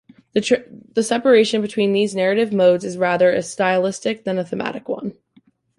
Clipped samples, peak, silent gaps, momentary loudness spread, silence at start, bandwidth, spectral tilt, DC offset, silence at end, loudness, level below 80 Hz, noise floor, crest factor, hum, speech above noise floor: under 0.1%; -2 dBFS; none; 11 LU; 0.35 s; 11.5 kHz; -5 dB/octave; under 0.1%; 0.65 s; -19 LUFS; -64 dBFS; -57 dBFS; 16 dB; none; 39 dB